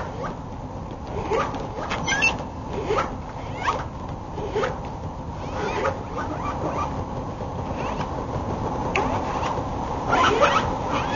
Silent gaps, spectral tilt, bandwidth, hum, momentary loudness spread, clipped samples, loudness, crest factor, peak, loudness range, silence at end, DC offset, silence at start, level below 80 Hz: none; -4 dB/octave; 7.2 kHz; none; 13 LU; under 0.1%; -26 LUFS; 20 dB; -6 dBFS; 5 LU; 0 s; under 0.1%; 0 s; -38 dBFS